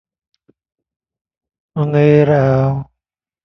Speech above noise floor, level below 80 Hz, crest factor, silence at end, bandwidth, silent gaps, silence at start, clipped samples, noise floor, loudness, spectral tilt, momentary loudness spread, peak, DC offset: 71 dB; -48 dBFS; 16 dB; 0.6 s; 6.2 kHz; none; 1.75 s; under 0.1%; -83 dBFS; -14 LUFS; -10 dB/octave; 13 LU; 0 dBFS; under 0.1%